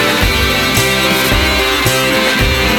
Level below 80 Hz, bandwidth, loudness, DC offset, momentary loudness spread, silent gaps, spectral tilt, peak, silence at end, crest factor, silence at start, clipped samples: -22 dBFS; over 20 kHz; -11 LUFS; 0.3%; 1 LU; none; -3.5 dB/octave; 0 dBFS; 0 s; 12 dB; 0 s; under 0.1%